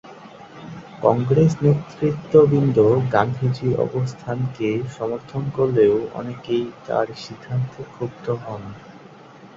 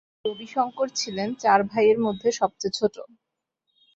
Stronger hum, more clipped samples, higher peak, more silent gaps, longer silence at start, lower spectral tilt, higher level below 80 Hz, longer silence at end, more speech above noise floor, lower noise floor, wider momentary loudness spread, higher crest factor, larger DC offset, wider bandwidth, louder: neither; neither; about the same, -2 dBFS vs -4 dBFS; neither; second, 0.05 s vs 0.25 s; first, -8.5 dB/octave vs -4 dB/octave; first, -54 dBFS vs -66 dBFS; second, 0.1 s vs 0.9 s; second, 24 dB vs 55 dB; second, -44 dBFS vs -79 dBFS; first, 18 LU vs 9 LU; about the same, 20 dB vs 20 dB; neither; about the same, 7.6 kHz vs 8 kHz; first, -21 LUFS vs -24 LUFS